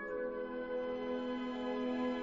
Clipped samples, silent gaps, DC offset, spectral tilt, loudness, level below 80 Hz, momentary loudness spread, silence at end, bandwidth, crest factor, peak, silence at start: under 0.1%; none; under 0.1%; -3 dB/octave; -39 LUFS; -68 dBFS; 4 LU; 0 s; 7.6 kHz; 12 dB; -28 dBFS; 0 s